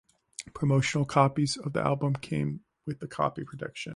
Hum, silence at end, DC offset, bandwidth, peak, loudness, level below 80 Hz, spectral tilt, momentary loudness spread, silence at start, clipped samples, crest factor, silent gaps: none; 0 s; under 0.1%; 11.5 kHz; -8 dBFS; -29 LUFS; -60 dBFS; -6 dB/octave; 15 LU; 0.4 s; under 0.1%; 22 dB; none